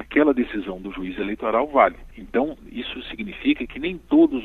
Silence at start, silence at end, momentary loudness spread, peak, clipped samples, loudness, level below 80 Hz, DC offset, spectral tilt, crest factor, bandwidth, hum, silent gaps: 0 s; 0 s; 14 LU; -2 dBFS; under 0.1%; -23 LUFS; -46 dBFS; under 0.1%; -7.5 dB/octave; 20 dB; 4.2 kHz; none; none